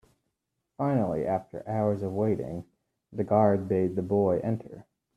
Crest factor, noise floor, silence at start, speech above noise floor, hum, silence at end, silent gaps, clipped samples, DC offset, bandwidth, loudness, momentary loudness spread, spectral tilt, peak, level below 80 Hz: 20 dB; -82 dBFS; 0.8 s; 55 dB; none; 0.35 s; none; under 0.1%; under 0.1%; 11 kHz; -28 LUFS; 12 LU; -10.5 dB/octave; -8 dBFS; -62 dBFS